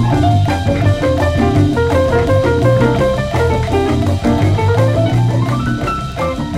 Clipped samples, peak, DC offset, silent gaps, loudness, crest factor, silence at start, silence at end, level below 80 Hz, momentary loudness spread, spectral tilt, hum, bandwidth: under 0.1%; 0 dBFS; under 0.1%; none; -14 LUFS; 12 dB; 0 s; 0 s; -26 dBFS; 4 LU; -7.5 dB/octave; none; 13.5 kHz